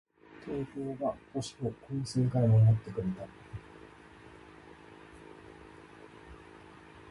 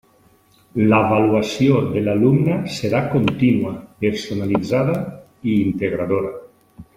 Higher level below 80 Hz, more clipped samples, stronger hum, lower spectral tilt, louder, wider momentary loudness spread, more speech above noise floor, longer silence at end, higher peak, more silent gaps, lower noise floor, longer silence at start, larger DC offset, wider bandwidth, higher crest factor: second, -58 dBFS vs -52 dBFS; neither; neither; about the same, -8 dB/octave vs -7.5 dB/octave; second, -31 LUFS vs -19 LUFS; first, 27 LU vs 10 LU; second, 24 dB vs 37 dB; second, 0 s vs 0.15 s; second, -16 dBFS vs -2 dBFS; neither; about the same, -54 dBFS vs -55 dBFS; second, 0.4 s vs 0.75 s; neither; second, 11 kHz vs 15.5 kHz; about the same, 18 dB vs 16 dB